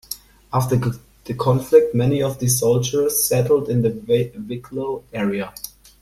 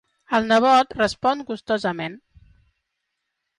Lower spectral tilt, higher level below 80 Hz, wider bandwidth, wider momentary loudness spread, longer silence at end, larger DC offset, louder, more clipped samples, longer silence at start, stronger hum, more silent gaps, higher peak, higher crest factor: about the same, -5.5 dB/octave vs -4.5 dB/octave; first, -48 dBFS vs -56 dBFS; first, 15.5 kHz vs 11 kHz; first, 16 LU vs 12 LU; second, 0.35 s vs 1.4 s; neither; about the same, -19 LUFS vs -21 LUFS; neither; second, 0.1 s vs 0.3 s; neither; neither; first, -2 dBFS vs -8 dBFS; about the same, 18 dB vs 16 dB